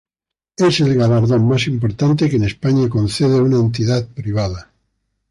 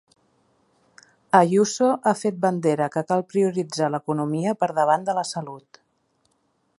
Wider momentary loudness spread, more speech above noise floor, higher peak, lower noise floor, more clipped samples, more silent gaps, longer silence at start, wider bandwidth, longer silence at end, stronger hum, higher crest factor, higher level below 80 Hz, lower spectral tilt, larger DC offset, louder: about the same, 7 LU vs 7 LU; first, 71 dB vs 47 dB; second, -6 dBFS vs -2 dBFS; first, -86 dBFS vs -69 dBFS; neither; neither; second, 0.6 s vs 1.35 s; about the same, 11.5 kHz vs 11.5 kHz; second, 0.7 s vs 1.2 s; neither; second, 10 dB vs 22 dB; first, -42 dBFS vs -72 dBFS; first, -7 dB/octave vs -5.5 dB/octave; neither; first, -16 LUFS vs -22 LUFS